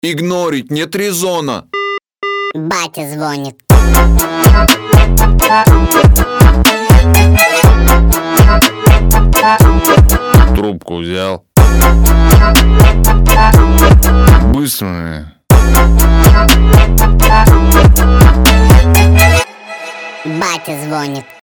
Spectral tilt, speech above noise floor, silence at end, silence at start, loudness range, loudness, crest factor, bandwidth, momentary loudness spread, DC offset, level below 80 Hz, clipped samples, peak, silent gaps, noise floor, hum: -5 dB/octave; 19 dB; 0.2 s; 0.05 s; 4 LU; -9 LUFS; 8 dB; over 20 kHz; 12 LU; under 0.1%; -10 dBFS; 0.6%; 0 dBFS; none; -27 dBFS; none